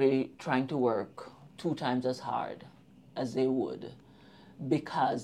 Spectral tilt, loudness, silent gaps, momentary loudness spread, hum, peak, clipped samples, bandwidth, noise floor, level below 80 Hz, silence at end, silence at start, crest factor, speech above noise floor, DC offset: -7 dB/octave; -32 LUFS; none; 15 LU; none; -14 dBFS; under 0.1%; 11 kHz; -56 dBFS; -74 dBFS; 0 s; 0 s; 18 dB; 24 dB; under 0.1%